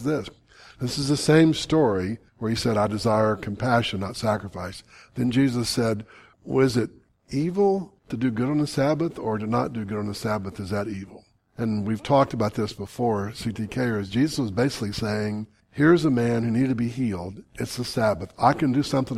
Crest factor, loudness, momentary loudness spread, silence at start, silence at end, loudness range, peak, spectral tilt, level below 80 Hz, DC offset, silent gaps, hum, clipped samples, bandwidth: 20 dB; -24 LUFS; 12 LU; 0 s; 0 s; 4 LU; -4 dBFS; -6 dB/octave; -52 dBFS; under 0.1%; none; none; under 0.1%; 15 kHz